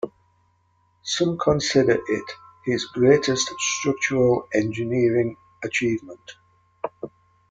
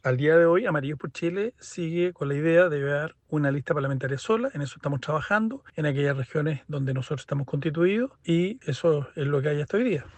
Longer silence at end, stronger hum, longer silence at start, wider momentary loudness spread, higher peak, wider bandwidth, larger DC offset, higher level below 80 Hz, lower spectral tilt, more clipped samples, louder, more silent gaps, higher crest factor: first, 0.45 s vs 0.1 s; neither; about the same, 0.05 s vs 0.05 s; first, 16 LU vs 10 LU; first, -4 dBFS vs -8 dBFS; about the same, 9.4 kHz vs 8.8 kHz; neither; first, -54 dBFS vs -62 dBFS; second, -4.5 dB/octave vs -7.5 dB/octave; neither; first, -22 LUFS vs -26 LUFS; neither; about the same, 20 dB vs 18 dB